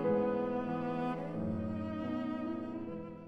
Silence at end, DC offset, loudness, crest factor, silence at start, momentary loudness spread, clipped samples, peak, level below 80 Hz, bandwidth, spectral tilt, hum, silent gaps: 0 s; under 0.1%; -37 LUFS; 16 dB; 0 s; 8 LU; under 0.1%; -20 dBFS; -64 dBFS; 7.6 kHz; -9 dB/octave; none; none